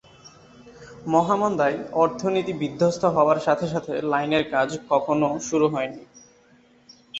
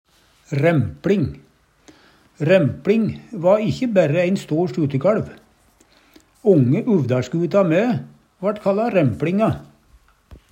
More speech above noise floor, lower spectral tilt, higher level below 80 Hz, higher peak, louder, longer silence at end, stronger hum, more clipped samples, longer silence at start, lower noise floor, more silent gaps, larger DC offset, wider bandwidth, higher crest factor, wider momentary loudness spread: second, 34 dB vs 38 dB; second, -5.5 dB/octave vs -8 dB/octave; second, -60 dBFS vs -54 dBFS; second, -6 dBFS vs -2 dBFS; second, -23 LUFS vs -19 LUFS; second, 0 s vs 0.15 s; neither; neither; second, 0.25 s vs 0.5 s; about the same, -56 dBFS vs -56 dBFS; neither; neither; second, 8.2 kHz vs 15.5 kHz; about the same, 18 dB vs 18 dB; about the same, 7 LU vs 9 LU